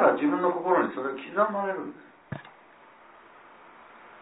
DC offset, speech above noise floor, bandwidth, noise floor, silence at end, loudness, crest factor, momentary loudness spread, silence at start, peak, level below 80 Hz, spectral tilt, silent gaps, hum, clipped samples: under 0.1%; 26 dB; 4 kHz; -54 dBFS; 0.05 s; -27 LUFS; 20 dB; 17 LU; 0 s; -8 dBFS; -76 dBFS; -10 dB/octave; none; none; under 0.1%